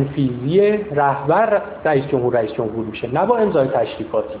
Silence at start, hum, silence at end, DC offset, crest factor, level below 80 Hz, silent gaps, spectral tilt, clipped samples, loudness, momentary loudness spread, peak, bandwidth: 0 s; none; 0 s; under 0.1%; 14 dB; -50 dBFS; none; -11 dB/octave; under 0.1%; -18 LUFS; 7 LU; -4 dBFS; 4 kHz